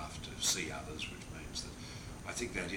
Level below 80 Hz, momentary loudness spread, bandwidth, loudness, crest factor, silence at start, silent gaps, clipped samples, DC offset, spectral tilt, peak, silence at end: -54 dBFS; 13 LU; over 20 kHz; -39 LUFS; 22 dB; 0 s; none; under 0.1%; under 0.1%; -2 dB/octave; -20 dBFS; 0 s